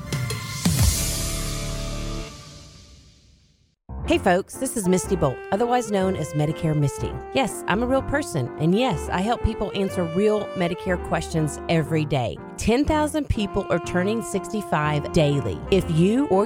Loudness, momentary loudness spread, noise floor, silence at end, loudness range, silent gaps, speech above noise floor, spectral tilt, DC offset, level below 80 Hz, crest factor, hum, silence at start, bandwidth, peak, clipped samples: -23 LUFS; 8 LU; -61 dBFS; 0 s; 4 LU; none; 39 dB; -5.5 dB/octave; under 0.1%; -36 dBFS; 20 dB; none; 0 s; 18 kHz; -4 dBFS; under 0.1%